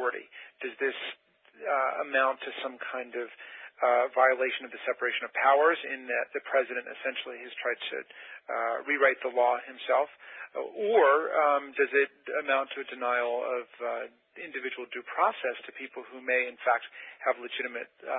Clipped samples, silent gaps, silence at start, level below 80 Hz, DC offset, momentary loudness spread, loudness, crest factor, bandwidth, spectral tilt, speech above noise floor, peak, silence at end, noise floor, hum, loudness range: under 0.1%; none; 0 s; -88 dBFS; under 0.1%; 15 LU; -29 LUFS; 22 dB; 4 kHz; -5.5 dB/octave; 27 dB; -8 dBFS; 0 s; -57 dBFS; none; 5 LU